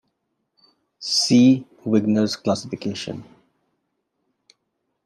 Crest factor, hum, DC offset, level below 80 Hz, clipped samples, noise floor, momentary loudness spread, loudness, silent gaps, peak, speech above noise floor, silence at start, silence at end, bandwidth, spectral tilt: 18 dB; none; under 0.1%; -68 dBFS; under 0.1%; -75 dBFS; 17 LU; -20 LUFS; none; -4 dBFS; 56 dB; 1 s; 1.8 s; 12.5 kHz; -5 dB/octave